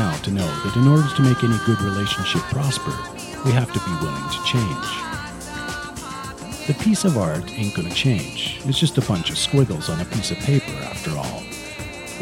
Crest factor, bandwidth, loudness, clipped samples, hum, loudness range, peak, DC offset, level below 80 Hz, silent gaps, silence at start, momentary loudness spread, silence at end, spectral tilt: 18 dB; 16.5 kHz; -22 LUFS; under 0.1%; none; 4 LU; -2 dBFS; under 0.1%; -44 dBFS; none; 0 s; 13 LU; 0 s; -5 dB/octave